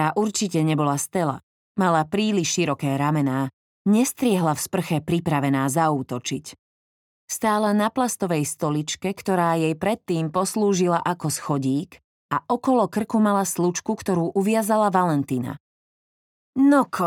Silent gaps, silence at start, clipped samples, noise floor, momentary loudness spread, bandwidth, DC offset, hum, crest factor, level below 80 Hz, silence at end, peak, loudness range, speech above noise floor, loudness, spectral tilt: 1.43-1.75 s, 3.53-3.85 s, 6.59-7.28 s, 12.04-12.29 s, 15.60-16.53 s; 0 s; under 0.1%; under -90 dBFS; 8 LU; 18.5 kHz; under 0.1%; none; 18 dB; -64 dBFS; 0 s; -4 dBFS; 2 LU; over 68 dB; -22 LUFS; -5.5 dB/octave